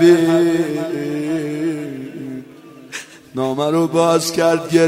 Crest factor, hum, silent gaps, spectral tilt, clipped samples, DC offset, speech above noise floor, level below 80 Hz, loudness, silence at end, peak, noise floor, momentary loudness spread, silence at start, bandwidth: 16 dB; none; none; -5.5 dB/octave; under 0.1%; under 0.1%; 26 dB; -60 dBFS; -17 LUFS; 0 s; 0 dBFS; -40 dBFS; 16 LU; 0 s; 15.5 kHz